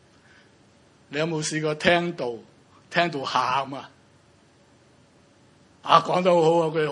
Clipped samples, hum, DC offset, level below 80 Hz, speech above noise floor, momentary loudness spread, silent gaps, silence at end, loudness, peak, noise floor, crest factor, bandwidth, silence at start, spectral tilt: under 0.1%; none; under 0.1%; -64 dBFS; 35 dB; 15 LU; none; 0 s; -23 LUFS; 0 dBFS; -57 dBFS; 26 dB; 11 kHz; 1.1 s; -4.5 dB/octave